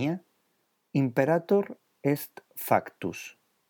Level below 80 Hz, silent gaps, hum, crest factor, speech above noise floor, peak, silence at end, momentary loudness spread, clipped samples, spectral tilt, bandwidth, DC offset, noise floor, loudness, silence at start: -78 dBFS; none; none; 22 dB; 46 dB; -8 dBFS; 0.4 s; 14 LU; under 0.1%; -7 dB/octave; over 20 kHz; under 0.1%; -74 dBFS; -29 LUFS; 0 s